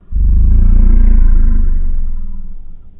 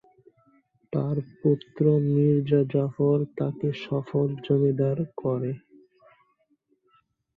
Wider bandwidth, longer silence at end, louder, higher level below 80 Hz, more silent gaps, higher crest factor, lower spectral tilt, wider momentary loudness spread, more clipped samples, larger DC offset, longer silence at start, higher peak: second, 1.7 kHz vs 4.7 kHz; second, 0.1 s vs 1.8 s; first, -15 LUFS vs -25 LUFS; first, -8 dBFS vs -66 dBFS; neither; second, 8 dB vs 16 dB; first, -13.5 dB/octave vs -10.5 dB/octave; first, 17 LU vs 8 LU; neither; neither; second, 0.1 s vs 0.9 s; first, 0 dBFS vs -10 dBFS